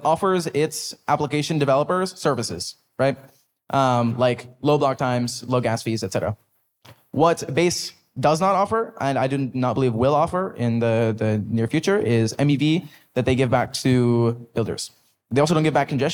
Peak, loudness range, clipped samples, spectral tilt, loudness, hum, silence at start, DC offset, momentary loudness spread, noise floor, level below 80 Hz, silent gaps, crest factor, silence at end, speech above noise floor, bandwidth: -6 dBFS; 2 LU; under 0.1%; -6 dB/octave; -22 LUFS; none; 0 s; under 0.1%; 7 LU; -52 dBFS; -58 dBFS; none; 16 dB; 0 s; 31 dB; 19 kHz